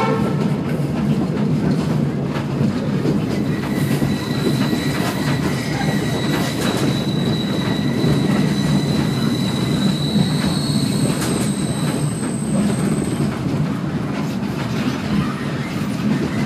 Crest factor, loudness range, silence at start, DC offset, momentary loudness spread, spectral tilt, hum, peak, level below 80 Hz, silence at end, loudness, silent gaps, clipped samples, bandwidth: 14 dB; 3 LU; 0 s; under 0.1%; 4 LU; -6 dB/octave; none; -4 dBFS; -42 dBFS; 0 s; -20 LUFS; none; under 0.1%; 15.5 kHz